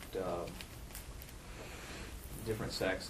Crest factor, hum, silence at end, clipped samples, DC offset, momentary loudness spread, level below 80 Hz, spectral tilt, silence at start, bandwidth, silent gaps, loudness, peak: 18 dB; none; 0 s; under 0.1%; under 0.1%; 12 LU; -52 dBFS; -4.5 dB/octave; 0 s; 15.5 kHz; none; -43 LUFS; -24 dBFS